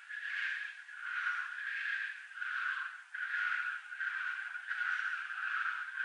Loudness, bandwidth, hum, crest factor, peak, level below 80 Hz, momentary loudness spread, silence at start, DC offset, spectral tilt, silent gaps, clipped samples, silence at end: -37 LUFS; 10 kHz; none; 14 dB; -24 dBFS; under -90 dBFS; 6 LU; 0 s; under 0.1%; 7.5 dB/octave; none; under 0.1%; 0 s